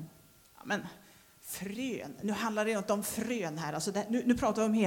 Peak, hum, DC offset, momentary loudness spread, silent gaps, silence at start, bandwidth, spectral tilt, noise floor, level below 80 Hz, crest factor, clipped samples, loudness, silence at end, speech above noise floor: -16 dBFS; none; under 0.1%; 13 LU; none; 0 s; 19 kHz; -4.5 dB/octave; -60 dBFS; -62 dBFS; 18 dB; under 0.1%; -34 LUFS; 0 s; 27 dB